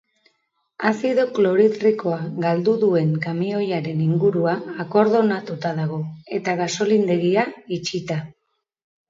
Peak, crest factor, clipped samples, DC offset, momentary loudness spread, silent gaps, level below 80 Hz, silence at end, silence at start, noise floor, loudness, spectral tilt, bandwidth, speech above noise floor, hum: -4 dBFS; 16 dB; under 0.1%; under 0.1%; 9 LU; none; -66 dBFS; 0.8 s; 0.8 s; -71 dBFS; -21 LUFS; -6.5 dB/octave; 7.8 kHz; 51 dB; none